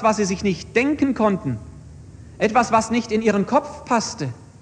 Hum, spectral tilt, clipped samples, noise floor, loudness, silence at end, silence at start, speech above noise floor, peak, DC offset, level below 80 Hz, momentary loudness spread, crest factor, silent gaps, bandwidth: none; -5 dB/octave; under 0.1%; -41 dBFS; -21 LUFS; 0.15 s; 0 s; 21 dB; -4 dBFS; under 0.1%; -48 dBFS; 11 LU; 18 dB; none; 10 kHz